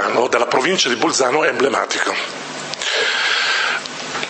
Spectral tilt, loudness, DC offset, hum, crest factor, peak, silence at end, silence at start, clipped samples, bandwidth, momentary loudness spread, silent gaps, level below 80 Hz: -1.5 dB/octave; -17 LUFS; under 0.1%; none; 18 dB; 0 dBFS; 0 s; 0 s; under 0.1%; 8.8 kHz; 8 LU; none; -66 dBFS